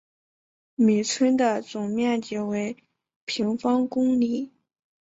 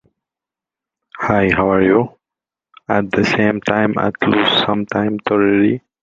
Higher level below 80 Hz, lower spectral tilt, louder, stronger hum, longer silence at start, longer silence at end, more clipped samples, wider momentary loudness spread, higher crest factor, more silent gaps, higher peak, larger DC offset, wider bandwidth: second, -68 dBFS vs -46 dBFS; second, -5 dB/octave vs -6.5 dB/octave; second, -24 LUFS vs -16 LUFS; neither; second, 0.8 s vs 1.15 s; first, 0.55 s vs 0.25 s; neither; first, 13 LU vs 6 LU; about the same, 16 dB vs 16 dB; first, 3.16-3.27 s vs none; second, -10 dBFS vs -2 dBFS; neither; about the same, 8 kHz vs 7.6 kHz